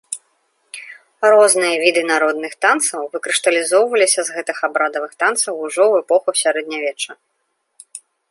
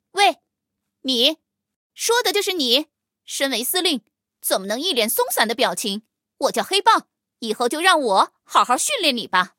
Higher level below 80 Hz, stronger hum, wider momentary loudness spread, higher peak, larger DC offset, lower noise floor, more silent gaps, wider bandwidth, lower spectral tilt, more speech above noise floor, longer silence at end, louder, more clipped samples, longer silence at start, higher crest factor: about the same, -74 dBFS vs -76 dBFS; neither; first, 20 LU vs 11 LU; about the same, 0 dBFS vs -2 dBFS; neither; second, -70 dBFS vs -80 dBFS; second, none vs 1.76-1.90 s; second, 12 kHz vs 17 kHz; about the same, -0.5 dB/octave vs -1 dB/octave; second, 54 dB vs 60 dB; first, 0.35 s vs 0.1 s; first, -16 LUFS vs -19 LUFS; neither; about the same, 0.1 s vs 0.15 s; about the same, 18 dB vs 20 dB